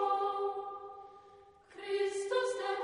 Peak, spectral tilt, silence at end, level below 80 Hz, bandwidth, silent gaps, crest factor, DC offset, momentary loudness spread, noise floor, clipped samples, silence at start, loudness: -20 dBFS; -2 dB/octave; 0 s; -78 dBFS; 10.5 kHz; none; 16 dB; under 0.1%; 19 LU; -59 dBFS; under 0.1%; 0 s; -35 LUFS